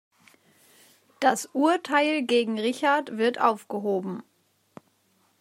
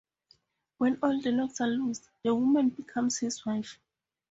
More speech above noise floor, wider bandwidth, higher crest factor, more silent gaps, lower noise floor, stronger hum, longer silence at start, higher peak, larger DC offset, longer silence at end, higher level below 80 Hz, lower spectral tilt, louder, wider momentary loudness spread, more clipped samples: first, 43 dB vs 38 dB; first, 16 kHz vs 8 kHz; about the same, 22 dB vs 18 dB; neither; about the same, -67 dBFS vs -67 dBFS; neither; first, 1.2 s vs 0.8 s; first, -6 dBFS vs -14 dBFS; neither; first, 1.2 s vs 0.6 s; second, -84 dBFS vs -70 dBFS; about the same, -4 dB/octave vs -4 dB/octave; first, -25 LUFS vs -29 LUFS; about the same, 7 LU vs 9 LU; neither